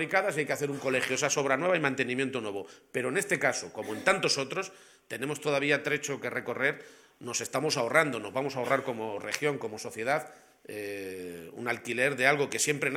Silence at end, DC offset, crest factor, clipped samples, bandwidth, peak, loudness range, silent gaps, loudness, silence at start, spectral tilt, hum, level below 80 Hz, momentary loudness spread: 0 s; under 0.1%; 24 dB; under 0.1%; 17 kHz; -6 dBFS; 4 LU; none; -30 LUFS; 0 s; -3 dB/octave; none; -74 dBFS; 12 LU